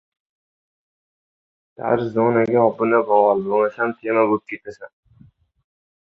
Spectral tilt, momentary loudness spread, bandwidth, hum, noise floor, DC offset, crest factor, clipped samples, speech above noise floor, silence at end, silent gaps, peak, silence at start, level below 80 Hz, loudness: -9 dB/octave; 13 LU; 6.4 kHz; none; -53 dBFS; under 0.1%; 20 dB; under 0.1%; 34 dB; 1.25 s; none; -2 dBFS; 1.8 s; -64 dBFS; -19 LUFS